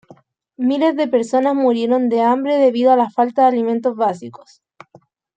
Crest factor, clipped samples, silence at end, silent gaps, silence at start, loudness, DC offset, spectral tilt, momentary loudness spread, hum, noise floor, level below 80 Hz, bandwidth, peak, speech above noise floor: 16 dB; under 0.1%; 1.05 s; none; 0.6 s; -16 LUFS; under 0.1%; -6 dB/octave; 6 LU; none; -51 dBFS; -72 dBFS; 9 kHz; -2 dBFS; 35 dB